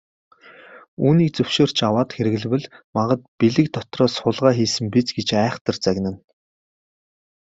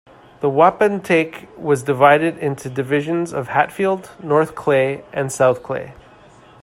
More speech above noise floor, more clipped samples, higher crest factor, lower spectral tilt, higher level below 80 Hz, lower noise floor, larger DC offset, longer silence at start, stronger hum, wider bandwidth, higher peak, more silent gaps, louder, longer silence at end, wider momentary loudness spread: about the same, 26 dB vs 28 dB; neither; about the same, 20 dB vs 18 dB; about the same, -6 dB/octave vs -6 dB/octave; about the same, -58 dBFS vs -58 dBFS; about the same, -45 dBFS vs -46 dBFS; neither; first, 0.7 s vs 0.4 s; neither; second, 7.8 kHz vs 15.5 kHz; about the same, -2 dBFS vs 0 dBFS; first, 0.88-0.97 s, 2.84-2.93 s, 3.28-3.39 s, 5.61-5.65 s vs none; about the same, -20 LUFS vs -18 LUFS; first, 1.25 s vs 0.7 s; second, 7 LU vs 12 LU